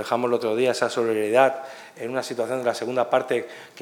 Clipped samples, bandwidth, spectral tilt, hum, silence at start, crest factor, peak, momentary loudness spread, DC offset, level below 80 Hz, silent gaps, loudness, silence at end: under 0.1%; 18.5 kHz; -4.5 dB/octave; none; 0 s; 20 dB; -4 dBFS; 13 LU; under 0.1%; -86 dBFS; none; -23 LUFS; 0 s